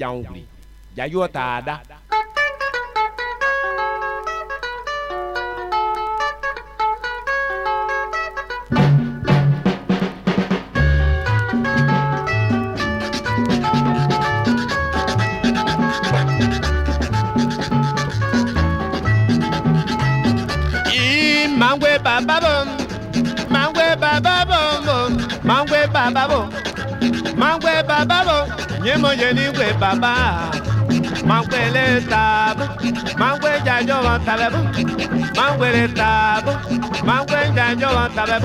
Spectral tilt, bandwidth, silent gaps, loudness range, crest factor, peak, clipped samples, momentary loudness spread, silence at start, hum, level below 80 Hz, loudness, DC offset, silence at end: -5.5 dB/octave; 14 kHz; none; 6 LU; 16 dB; -2 dBFS; under 0.1%; 8 LU; 0 s; none; -32 dBFS; -18 LUFS; under 0.1%; 0 s